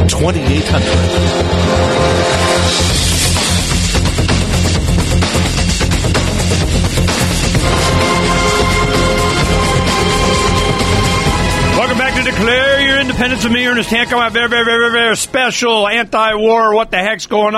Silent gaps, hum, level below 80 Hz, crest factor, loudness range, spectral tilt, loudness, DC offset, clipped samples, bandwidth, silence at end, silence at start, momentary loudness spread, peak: none; none; -22 dBFS; 12 dB; 2 LU; -4 dB/octave; -12 LUFS; under 0.1%; under 0.1%; 13.5 kHz; 0 s; 0 s; 3 LU; 0 dBFS